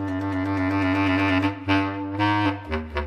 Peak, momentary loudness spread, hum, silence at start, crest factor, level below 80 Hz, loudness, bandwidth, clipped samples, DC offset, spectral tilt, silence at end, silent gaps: -10 dBFS; 6 LU; none; 0 s; 14 dB; -42 dBFS; -23 LUFS; 9.6 kHz; under 0.1%; under 0.1%; -7 dB/octave; 0 s; none